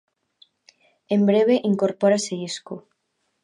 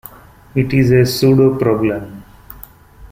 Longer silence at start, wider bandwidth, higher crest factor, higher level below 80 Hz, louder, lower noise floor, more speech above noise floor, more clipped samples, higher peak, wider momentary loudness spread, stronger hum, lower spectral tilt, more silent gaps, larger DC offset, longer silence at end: first, 1.1 s vs 0.55 s; second, 10.5 kHz vs 16 kHz; about the same, 16 dB vs 14 dB; second, -74 dBFS vs -42 dBFS; second, -21 LUFS vs -14 LUFS; first, -74 dBFS vs -39 dBFS; first, 53 dB vs 27 dB; neither; second, -6 dBFS vs -2 dBFS; second, 15 LU vs 24 LU; neither; second, -5.5 dB/octave vs -7 dB/octave; neither; neither; first, 0.65 s vs 0.05 s